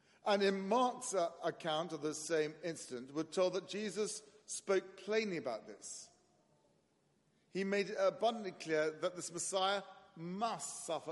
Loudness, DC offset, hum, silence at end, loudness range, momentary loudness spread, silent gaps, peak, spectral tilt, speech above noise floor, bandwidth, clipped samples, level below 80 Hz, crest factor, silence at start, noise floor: -38 LUFS; under 0.1%; none; 0 s; 4 LU; 12 LU; none; -20 dBFS; -3.5 dB/octave; 38 dB; 11.5 kHz; under 0.1%; -88 dBFS; 20 dB; 0.25 s; -76 dBFS